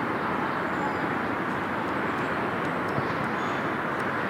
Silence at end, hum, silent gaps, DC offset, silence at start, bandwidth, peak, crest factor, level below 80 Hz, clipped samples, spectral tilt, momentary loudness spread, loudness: 0 s; none; none; under 0.1%; 0 s; 16 kHz; -16 dBFS; 12 dB; -58 dBFS; under 0.1%; -6.5 dB/octave; 1 LU; -28 LUFS